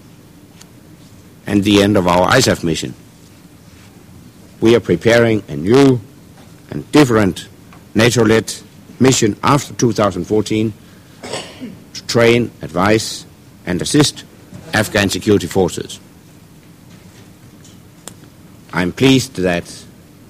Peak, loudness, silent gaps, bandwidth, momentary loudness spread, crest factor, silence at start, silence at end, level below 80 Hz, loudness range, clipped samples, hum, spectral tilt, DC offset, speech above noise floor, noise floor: 0 dBFS; -14 LUFS; none; 16 kHz; 19 LU; 16 dB; 1.45 s; 0.5 s; -44 dBFS; 5 LU; under 0.1%; none; -5 dB/octave; under 0.1%; 28 dB; -42 dBFS